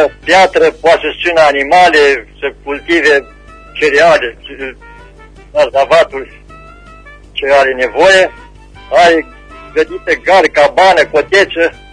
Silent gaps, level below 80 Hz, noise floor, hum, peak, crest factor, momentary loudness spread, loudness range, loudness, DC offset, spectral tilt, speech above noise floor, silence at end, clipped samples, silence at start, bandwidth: none; -38 dBFS; -36 dBFS; none; 0 dBFS; 10 dB; 14 LU; 4 LU; -9 LUFS; under 0.1%; -3 dB/octave; 26 dB; 0.2 s; 0.1%; 0 s; 10.5 kHz